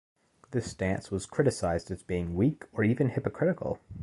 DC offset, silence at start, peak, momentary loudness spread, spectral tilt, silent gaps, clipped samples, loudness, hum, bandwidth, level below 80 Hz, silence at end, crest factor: under 0.1%; 0.5 s; -12 dBFS; 7 LU; -7 dB/octave; none; under 0.1%; -30 LUFS; none; 11.5 kHz; -50 dBFS; 0 s; 18 dB